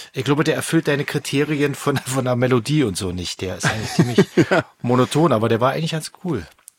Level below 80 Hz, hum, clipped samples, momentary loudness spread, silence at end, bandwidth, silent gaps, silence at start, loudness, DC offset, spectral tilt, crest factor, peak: -52 dBFS; none; under 0.1%; 9 LU; 0.3 s; 17 kHz; none; 0 s; -20 LUFS; under 0.1%; -5.5 dB/octave; 18 dB; -2 dBFS